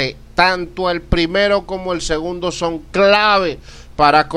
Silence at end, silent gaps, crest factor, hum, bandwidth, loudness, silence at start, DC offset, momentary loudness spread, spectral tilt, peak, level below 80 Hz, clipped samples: 0 s; none; 16 dB; none; 12 kHz; -16 LUFS; 0 s; under 0.1%; 10 LU; -4.5 dB/octave; 0 dBFS; -34 dBFS; under 0.1%